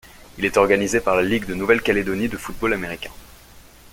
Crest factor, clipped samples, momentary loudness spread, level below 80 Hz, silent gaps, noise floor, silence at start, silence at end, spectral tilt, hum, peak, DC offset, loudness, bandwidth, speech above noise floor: 20 dB; under 0.1%; 10 LU; -42 dBFS; none; -46 dBFS; 0.05 s; 0.05 s; -4.5 dB/octave; none; -2 dBFS; under 0.1%; -20 LUFS; 17 kHz; 26 dB